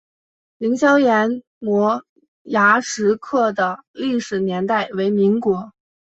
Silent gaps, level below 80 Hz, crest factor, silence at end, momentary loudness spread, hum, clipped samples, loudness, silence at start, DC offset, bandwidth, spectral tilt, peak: 1.47-1.61 s, 2.09-2.16 s, 2.28-2.45 s, 3.87-3.94 s; -64 dBFS; 18 dB; 0.35 s; 9 LU; none; under 0.1%; -19 LUFS; 0.6 s; under 0.1%; 8.2 kHz; -5 dB/octave; -2 dBFS